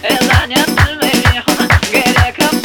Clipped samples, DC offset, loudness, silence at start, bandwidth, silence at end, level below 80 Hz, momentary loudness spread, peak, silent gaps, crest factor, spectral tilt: 0.4%; under 0.1%; -11 LUFS; 0 s; over 20 kHz; 0 s; -24 dBFS; 2 LU; 0 dBFS; none; 12 dB; -4 dB/octave